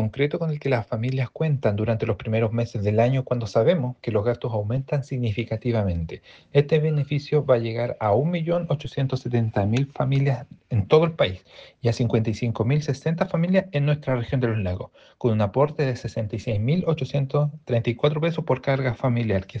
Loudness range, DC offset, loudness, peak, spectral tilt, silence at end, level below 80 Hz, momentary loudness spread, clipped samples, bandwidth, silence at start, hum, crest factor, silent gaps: 2 LU; under 0.1%; -24 LUFS; -4 dBFS; -8 dB/octave; 0 s; -52 dBFS; 6 LU; under 0.1%; 7.6 kHz; 0 s; none; 20 dB; none